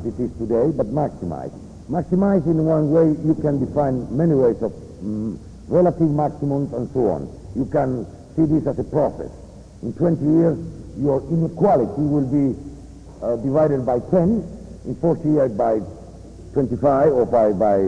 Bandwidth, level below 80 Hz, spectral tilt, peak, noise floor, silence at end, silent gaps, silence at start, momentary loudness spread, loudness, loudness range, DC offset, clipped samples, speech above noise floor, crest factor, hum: 10 kHz; -44 dBFS; -10.5 dB/octave; -6 dBFS; -39 dBFS; 0 s; none; 0 s; 15 LU; -20 LUFS; 3 LU; under 0.1%; under 0.1%; 20 dB; 14 dB; none